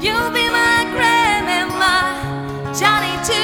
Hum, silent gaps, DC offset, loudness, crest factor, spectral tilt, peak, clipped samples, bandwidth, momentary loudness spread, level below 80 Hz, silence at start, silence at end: none; none; under 0.1%; -16 LUFS; 16 dB; -3 dB/octave; 0 dBFS; under 0.1%; 19.5 kHz; 10 LU; -40 dBFS; 0 s; 0 s